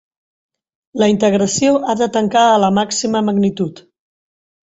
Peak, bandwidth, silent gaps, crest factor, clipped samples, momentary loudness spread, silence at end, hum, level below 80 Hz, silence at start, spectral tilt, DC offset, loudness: -2 dBFS; 8 kHz; none; 14 dB; under 0.1%; 6 LU; 0.9 s; none; -54 dBFS; 0.95 s; -4.5 dB/octave; under 0.1%; -15 LUFS